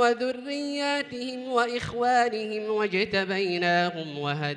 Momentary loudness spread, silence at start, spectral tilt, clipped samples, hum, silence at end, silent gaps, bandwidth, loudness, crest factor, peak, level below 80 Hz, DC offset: 7 LU; 0 s; -5 dB/octave; under 0.1%; none; 0 s; none; 11 kHz; -27 LUFS; 16 dB; -10 dBFS; -64 dBFS; under 0.1%